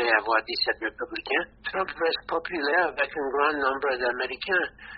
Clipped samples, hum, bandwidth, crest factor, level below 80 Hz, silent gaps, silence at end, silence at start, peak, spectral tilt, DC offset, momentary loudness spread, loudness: under 0.1%; none; 5.4 kHz; 20 dB; -58 dBFS; none; 0 s; 0 s; -8 dBFS; 0.5 dB/octave; under 0.1%; 6 LU; -26 LUFS